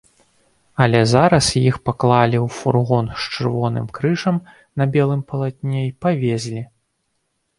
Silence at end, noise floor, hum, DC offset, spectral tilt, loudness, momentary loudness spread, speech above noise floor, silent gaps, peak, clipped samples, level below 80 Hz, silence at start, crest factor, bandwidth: 0.95 s; -70 dBFS; none; under 0.1%; -6 dB/octave; -18 LUFS; 11 LU; 53 dB; none; 0 dBFS; under 0.1%; -48 dBFS; 0.8 s; 18 dB; 11.5 kHz